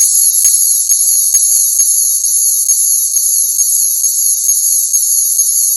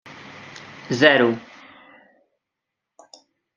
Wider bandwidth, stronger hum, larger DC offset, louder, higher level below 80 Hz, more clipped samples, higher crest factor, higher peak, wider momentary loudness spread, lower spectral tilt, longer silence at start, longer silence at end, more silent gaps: first, over 20 kHz vs 7.4 kHz; neither; neither; first, -8 LUFS vs -18 LUFS; about the same, -68 dBFS vs -68 dBFS; first, 0.3% vs under 0.1%; second, 10 dB vs 24 dB; about the same, 0 dBFS vs -2 dBFS; second, 2 LU vs 25 LU; second, 5.5 dB/octave vs -5 dB/octave; about the same, 0 s vs 0.1 s; second, 0 s vs 2.15 s; neither